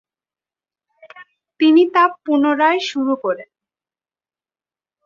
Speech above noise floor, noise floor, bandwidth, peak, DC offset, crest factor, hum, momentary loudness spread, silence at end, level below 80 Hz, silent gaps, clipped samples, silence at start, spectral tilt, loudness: over 75 dB; under -90 dBFS; 7.4 kHz; -2 dBFS; under 0.1%; 18 dB; none; 9 LU; 1.6 s; -70 dBFS; none; under 0.1%; 1.15 s; -4 dB/octave; -16 LUFS